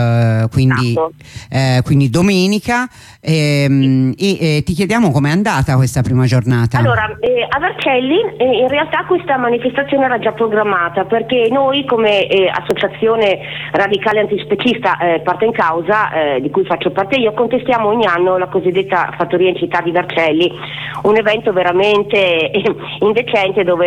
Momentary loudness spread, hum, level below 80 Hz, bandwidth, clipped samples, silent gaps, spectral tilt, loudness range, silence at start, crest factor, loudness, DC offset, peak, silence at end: 4 LU; none; -42 dBFS; 14 kHz; under 0.1%; none; -6.5 dB/octave; 1 LU; 0 s; 12 dB; -14 LUFS; under 0.1%; -2 dBFS; 0 s